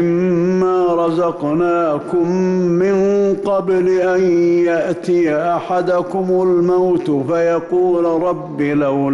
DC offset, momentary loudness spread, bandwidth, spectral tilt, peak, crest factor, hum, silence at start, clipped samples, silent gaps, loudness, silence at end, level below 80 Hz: under 0.1%; 4 LU; 7.4 kHz; -8 dB/octave; -8 dBFS; 8 dB; none; 0 s; under 0.1%; none; -16 LUFS; 0 s; -52 dBFS